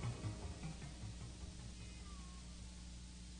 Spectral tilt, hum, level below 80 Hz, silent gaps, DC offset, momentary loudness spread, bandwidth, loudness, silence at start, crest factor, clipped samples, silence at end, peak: -5 dB/octave; none; -54 dBFS; none; under 0.1%; 6 LU; 9.6 kHz; -52 LUFS; 0 s; 16 dB; under 0.1%; 0 s; -32 dBFS